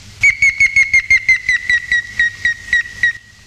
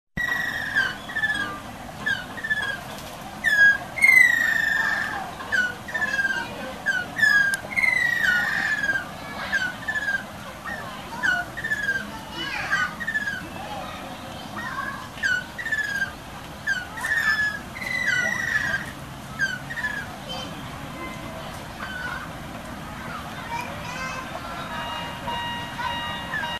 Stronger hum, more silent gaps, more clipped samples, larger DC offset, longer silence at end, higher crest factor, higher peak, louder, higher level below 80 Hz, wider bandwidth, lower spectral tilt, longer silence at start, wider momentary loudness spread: neither; neither; neither; second, under 0.1% vs 0.1%; first, 0.3 s vs 0 s; second, 12 dB vs 22 dB; about the same, -2 dBFS vs -4 dBFS; first, -12 LUFS vs -24 LUFS; first, -40 dBFS vs -50 dBFS; about the same, 14 kHz vs 13.5 kHz; second, 0 dB/octave vs -2.5 dB/octave; about the same, 0.05 s vs 0.15 s; second, 7 LU vs 15 LU